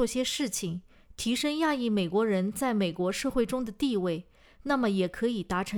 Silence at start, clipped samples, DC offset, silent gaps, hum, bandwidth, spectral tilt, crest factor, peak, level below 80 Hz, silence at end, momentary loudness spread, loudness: 0 s; under 0.1%; under 0.1%; none; none; over 20 kHz; -4.5 dB/octave; 16 dB; -14 dBFS; -54 dBFS; 0 s; 6 LU; -29 LUFS